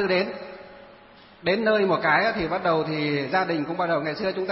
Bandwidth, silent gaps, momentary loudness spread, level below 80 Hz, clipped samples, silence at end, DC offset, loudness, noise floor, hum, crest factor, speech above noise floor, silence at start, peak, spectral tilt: 5.8 kHz; none; 10 LU; -58 dBFS; under 0.1%; 0 s; under 0.1%; -24 LUFS; -50 dBFS; none; 18 dB; 27 dB; 0 s; -6 dBFS; -9 dB/octave